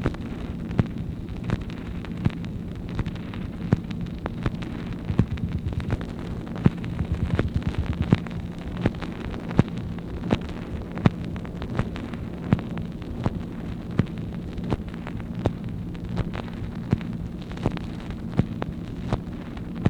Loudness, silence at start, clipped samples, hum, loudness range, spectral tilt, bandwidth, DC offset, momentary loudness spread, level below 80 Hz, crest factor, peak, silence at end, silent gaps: -29 LUFS; 0 s; under 0.1%; none; 3 LU; -8.5 dB/octave; 10 kHz; under 0.1%; 9 LU; -36 dBFS; 28 dB; 0 dBFS; 0 s; none